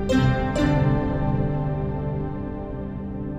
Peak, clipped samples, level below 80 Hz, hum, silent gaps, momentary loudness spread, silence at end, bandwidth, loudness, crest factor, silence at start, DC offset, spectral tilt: -8 dBFS; under 0.1%; -32 dBFS; none; none; 11 LU; 0 s; 9.8 kHz; -24 LUFS; 14 dB; 0 s; under 0.1%; -8 dB/octave